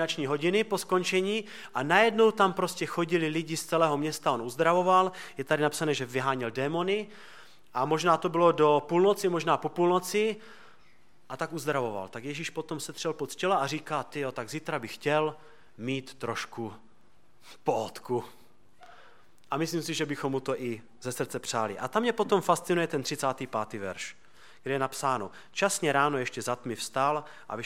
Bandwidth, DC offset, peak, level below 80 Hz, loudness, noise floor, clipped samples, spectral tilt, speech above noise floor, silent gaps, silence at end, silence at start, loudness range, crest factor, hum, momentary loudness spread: 16.5 kHz; 0.3%; -6 dBFS; -74 dBFS; -29 LUFS; -65 dBFS; under 0.1%; -4.5 dB/octave; 36 dB; none; 0 s; 0 s; 8 LU; 22 dB; none; 12 LU